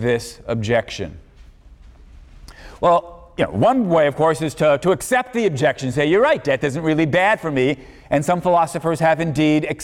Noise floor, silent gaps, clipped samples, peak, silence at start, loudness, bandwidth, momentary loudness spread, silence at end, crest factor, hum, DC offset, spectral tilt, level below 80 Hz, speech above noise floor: -44 dBFS; none; under 0.1%; -6 dBFS; 0 s; -18 LUFS; 16 kHz; 8 LU; 0 s; 14 dB; none; under 0.1%; -6 dB/octave; -46 dBFS; 26 dB